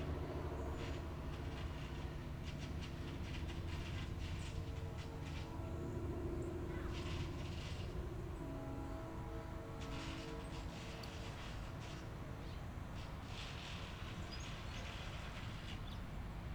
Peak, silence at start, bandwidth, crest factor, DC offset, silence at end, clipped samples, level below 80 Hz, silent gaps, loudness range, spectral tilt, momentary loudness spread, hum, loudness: -32 dBFS; 0 s; over 20 kHz; 14 dB; under 0.1%; 0 s; under 0.1%; -50 dBFS; none; 3 LU; -6 dB/octave; 4 LU; none; -47 LUFS